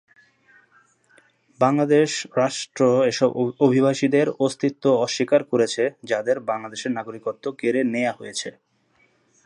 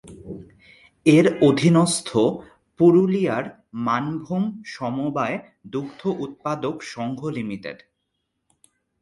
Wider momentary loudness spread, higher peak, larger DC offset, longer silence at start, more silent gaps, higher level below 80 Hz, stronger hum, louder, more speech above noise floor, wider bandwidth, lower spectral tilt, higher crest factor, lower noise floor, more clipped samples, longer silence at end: second, 10 LU vs 18 LU; about the same, -4 dBFS vs -4 dBFS; neither; first, 1.6 s vs 0.05 s; neither; second, -74 dBFS vs -60 dBFS; neither; about the same, -22 LUFS vs -22 LUFS; second, 42 dB vs 55 dB; about the same, 11 kHz vs 11.5 kHz; about the same, -5 dB/octave vs -6 dB/octave; about the same, 18 dB vs 20 dB; second, -63 dBFS vs -76 dBFS; neither; second, 0.95 s vs 1.25 s